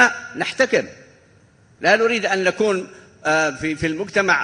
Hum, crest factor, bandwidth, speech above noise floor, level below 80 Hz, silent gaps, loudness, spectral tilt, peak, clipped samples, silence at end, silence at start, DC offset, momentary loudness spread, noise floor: none; 20 dB; 10.5 kHz; 33 dB; -54 dBFS; none; -19 LUFS; -3.5 dB/octave; 0 dBFS; under 0.1%; 0 s; 0 s; under 0.1%; 9 LU; -53 dBFS